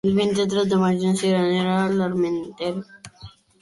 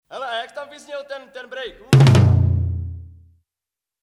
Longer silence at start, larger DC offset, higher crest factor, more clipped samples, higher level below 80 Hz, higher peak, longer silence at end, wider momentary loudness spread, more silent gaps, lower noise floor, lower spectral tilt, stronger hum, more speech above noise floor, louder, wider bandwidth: about the same, 0.05 s vs 0.1 s; neither; second, 12 dB vs 20 dB; neither; second, -58 dBFS vs -40 dBFS; second, -8 dBFS vs 0 dBFS; second, 0.35 s vs 0.95 s; second, 14 LU vs 21 LU; neither; second, -45 dBFS vs -88 dBFS; about the same, -6 dB/octave vs -7 dB/octave; neither; second, 25 dB vs 69 dB; second, -21 LUFS vs -17 LUFS; about the same, 11.5 kHz vs 12 kHz